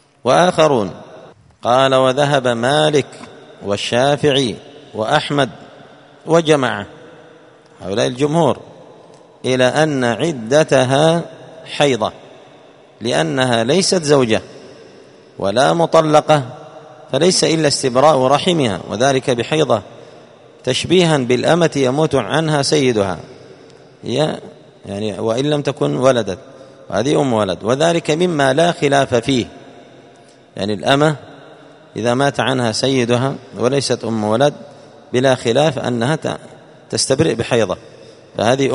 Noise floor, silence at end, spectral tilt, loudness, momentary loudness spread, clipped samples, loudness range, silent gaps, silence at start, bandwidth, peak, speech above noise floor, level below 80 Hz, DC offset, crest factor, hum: -45 dBFS; 0 s; -4.5 dB/octave; -16 LUFS; 13 LU; under 0.1%; 4 LU; none; 0.25 s; 11 kHz; 0 dBFS; 30 dB; -54 dBFS; under 0.1%; 16 dB; none